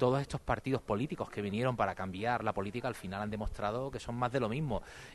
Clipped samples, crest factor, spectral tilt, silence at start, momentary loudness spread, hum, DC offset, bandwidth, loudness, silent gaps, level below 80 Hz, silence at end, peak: under 0.1%; 20 dB; -6.5 dB/octave; 0 s; 6 LU; none; under 0.1%; 12 kHz; -36 LUFS; none; -50 dBFS; 0 s; -14 dBFS